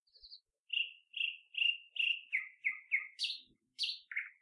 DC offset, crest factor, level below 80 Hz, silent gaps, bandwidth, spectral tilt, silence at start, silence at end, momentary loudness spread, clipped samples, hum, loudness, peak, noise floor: under 0.1%; 18 dB; -88 dBFS; 0.59-0.65 s; 11.5 kHz; 4.5 dB/octave; 0.25 s; 0.1 s; 10 LU; under 0.1%; none; -36 LUFS; -22 dBFS; -60 dBFS